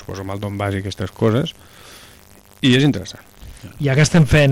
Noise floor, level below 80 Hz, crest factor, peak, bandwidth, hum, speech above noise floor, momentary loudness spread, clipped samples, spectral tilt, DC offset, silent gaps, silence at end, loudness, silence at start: -46 dBFS; -38 dBFS; 14 dB; -4 dBFS; 16 kHz; none; 29 dB; 20 LU; under 0.1%; -6 dB/octave; under 0.1%; none; 0 s; -18 LUFS; 0 s